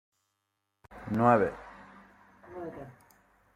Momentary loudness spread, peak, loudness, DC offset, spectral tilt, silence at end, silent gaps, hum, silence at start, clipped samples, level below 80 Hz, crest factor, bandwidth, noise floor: 26 LU; -10 dBFS; -27 LUFS; under 0.1%; -8.5 dB/octave; 0.65 s; none; none; 0.9 s; under 0.1%; -62 dBFS; 24 dB; 14 kHz; -82 dBFS